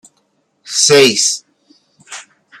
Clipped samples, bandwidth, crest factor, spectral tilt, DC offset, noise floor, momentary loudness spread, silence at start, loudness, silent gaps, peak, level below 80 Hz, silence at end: under 0.1%; 15.5 kHz; 16 dB; -1.5 dB/octave; under 0.1%; -62 dBFS; 24 LU; 0.65 s; -11 LUFS; none; 0 dBFS; -64 dBFS; 0.4 s